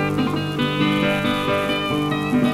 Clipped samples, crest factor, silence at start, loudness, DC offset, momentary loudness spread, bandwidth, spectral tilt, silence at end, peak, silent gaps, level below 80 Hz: under 0.1%; 14 dB; 0 s; -20 LUFS; under 0.1%; 3 LU; 16 kHz; -6 dB/octave; 0 s; -6 dBFS; none; -46 dBFS